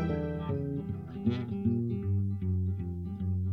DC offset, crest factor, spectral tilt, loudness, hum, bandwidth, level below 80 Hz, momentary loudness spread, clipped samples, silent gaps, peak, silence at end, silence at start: under 0.1%; 14 dB; -10.5 dB/octave; -33 LUFS; none; 4.8 kHz; -50 dBFS; 5 LU; under 0.1%; none; -16 dBFS; 0 s; 0 s